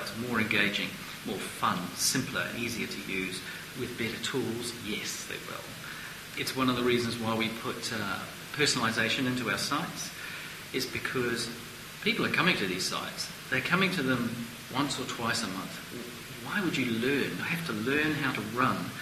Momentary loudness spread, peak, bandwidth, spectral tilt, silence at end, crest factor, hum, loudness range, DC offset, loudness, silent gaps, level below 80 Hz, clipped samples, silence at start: 12 LU; -8 dBFS; 15.5 kHz; -3.5 dB/octave; 0 s; 24 dB; none; 4 LU; under 0.1%; -31 LUFS; none; -60 dBFS; under 0.1%; 0 s